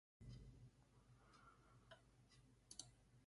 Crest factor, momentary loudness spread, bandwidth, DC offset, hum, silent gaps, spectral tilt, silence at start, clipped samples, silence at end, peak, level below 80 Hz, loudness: 30 dB; 10 LU; 11.5 kHz; under 0.1%; none; none; -3.5 dB/octave; 0.2 s; under 0.1%; 0 s; -36 dBFS; -74 dBFS; -64 LUFS